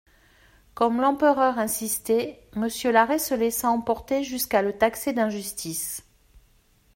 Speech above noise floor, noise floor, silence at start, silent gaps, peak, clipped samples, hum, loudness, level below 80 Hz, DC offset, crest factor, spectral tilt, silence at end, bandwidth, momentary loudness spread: 37 dB; -61 dBFS; 0.75 s; none; -6 dBFS; under 0.1%; none; -24 LUFS; -56 dBFS; under 0.1%; 20 dB; -3.5 dB/octave; 0.95 s; 16.5 kHz; 9 LU